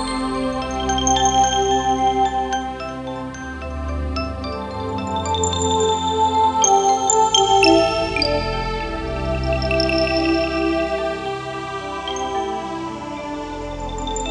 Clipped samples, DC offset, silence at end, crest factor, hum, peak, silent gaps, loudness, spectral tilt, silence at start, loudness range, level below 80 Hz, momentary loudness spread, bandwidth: under 0.1%; under 0.1%; 0 s; 18 dB; 50 Hz at -60 dBFS; -2 dBFS; none; -20 LUFS; -3.5 dB/octave; 0 s; 9 LU; -34 dBFS; 14 LU; 10.5 kHz